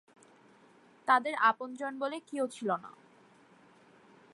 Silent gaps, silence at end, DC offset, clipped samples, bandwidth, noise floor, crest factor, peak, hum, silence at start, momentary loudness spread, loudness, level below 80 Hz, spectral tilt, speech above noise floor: none; 1.45 s; under 0.1%; under 0.1%; 11.5 kHz; -61 dBFS; 22 dB; -12 dBFS; none; 1.05 s; 11 LU; -32 LUFS; -90 dBFS; -4 dB/octave; 30 dB